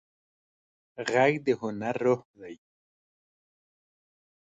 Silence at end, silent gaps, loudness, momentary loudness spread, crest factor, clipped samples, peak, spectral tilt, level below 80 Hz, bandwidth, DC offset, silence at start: 2.05 s; 2.25-2.34 s; -27 LUFS; 22 LU; 22 dB; under 0.1%; -10 dBFS; -6 dB/octave; -72 dBFS; 8.8 kHz; under 0.1%; 0.95 s